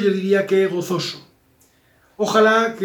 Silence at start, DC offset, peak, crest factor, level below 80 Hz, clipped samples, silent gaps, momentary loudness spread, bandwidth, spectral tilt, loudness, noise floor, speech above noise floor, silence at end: 0 s; under 0.1%; -4 dBFS; 16 dB; -68 dBFS; under 0.1%; none; 12 LU; over 20 kHz; -5 dB/octave; -18 LUFS; -57 dBFS; 40 dB; 0 s